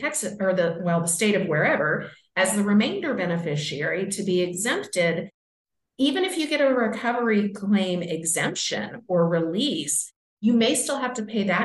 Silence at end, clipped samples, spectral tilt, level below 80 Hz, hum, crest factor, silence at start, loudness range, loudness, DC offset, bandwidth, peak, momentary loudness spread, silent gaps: 0 s; under 0.1%; -4 dB/octave; -72 dBFS; none; 16 dB; 0 s; 2 LU; -24 LUFS; under 0.1%; 12 kHz; -8 dBFS; 6 LU; 5.34-5.65 s, 10.16-10.37 s